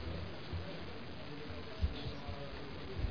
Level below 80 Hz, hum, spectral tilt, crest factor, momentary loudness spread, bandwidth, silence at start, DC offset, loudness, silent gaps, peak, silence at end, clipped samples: -48 dBFS; none; -5 dB/octave; 20 dB; 7 LU; 5.4 kHz; 0 s; 0.4%; -45 LUFS; none; -22 dBFS; 0 s; under 0.1%